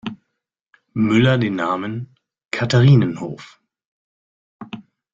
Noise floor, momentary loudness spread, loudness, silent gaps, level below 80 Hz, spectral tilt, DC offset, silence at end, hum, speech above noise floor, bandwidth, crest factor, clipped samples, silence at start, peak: -78 dBFS; 23 LU; -18 LUFS; 3.85-4.59 s; -54 dBFS; -7 dB/octave; under 0.1%; 0.35 s; none; 62 dB; 7.6 kHz; 18 dB; under 0.1%; 0.05 s; -2 dBFS